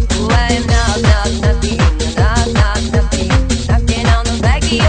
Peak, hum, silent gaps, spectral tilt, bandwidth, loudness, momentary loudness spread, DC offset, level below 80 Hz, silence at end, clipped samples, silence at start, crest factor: 0 dBFS; none; none; -5 dB/octave; 9.4 kHz; -14 LUFS; 2 LU; under 0.1%; -16 dBFS; 0 s; under 0.1%; 0 s; 12 dB